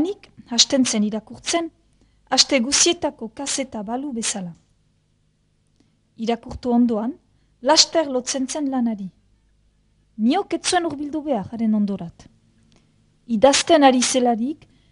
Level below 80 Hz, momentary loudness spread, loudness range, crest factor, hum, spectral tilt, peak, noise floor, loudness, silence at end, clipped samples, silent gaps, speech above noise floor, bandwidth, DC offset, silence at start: -54 dBFS; 15 LU; 7 LU; 22 dB; none; -2.5 dB/octave; 0 dBFS; -64 dBFS; -20 LUFS; 0.35 s; under 0.1%; none; 44 dB; 11 kHz; under 0.1%; 0 s